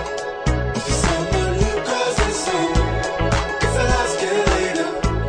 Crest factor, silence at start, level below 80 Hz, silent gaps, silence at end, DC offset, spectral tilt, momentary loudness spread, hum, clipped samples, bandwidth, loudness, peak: 16 dB; 0 s; -26 dBFS; none; 0 s; under 0.1%; -4.5 dB/octave; 4 LU; none; under 0.1%; 10.5 kHz; -20 LUFS; -2 dBFS